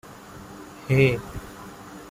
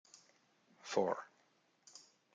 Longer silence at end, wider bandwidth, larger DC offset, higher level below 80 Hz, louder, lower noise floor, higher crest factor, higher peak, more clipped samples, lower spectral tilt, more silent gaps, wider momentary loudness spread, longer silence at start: second, 0 s vs 0.35 s; first, 16 kHz vs 9.4 kHz; neither; first, -48 dBFS vs under -90 dBFS; first, -22 LUFS vs -39 LUFS; second, -43 dBFS vs -75 dBFS; about the same, 20 dB vs 24 dB; first, -6 dBFS vs -20 dBFS; neither; first, -7 dB/octave vs -4 dB/octave; neither; about the same, 22 LU vs 23 LU; about the same, 0.1 s vs 0.15 s